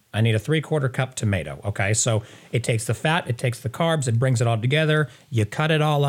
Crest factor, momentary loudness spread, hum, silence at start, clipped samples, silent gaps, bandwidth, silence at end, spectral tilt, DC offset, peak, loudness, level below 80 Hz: 16 dB; 6 LU; none; 0.15 s; under 0.1%; none; 15.5 kHz; 0 s; -5 dB/octave; under 0.1%; -6 dBFS; -23 LUFS; -58 dBFS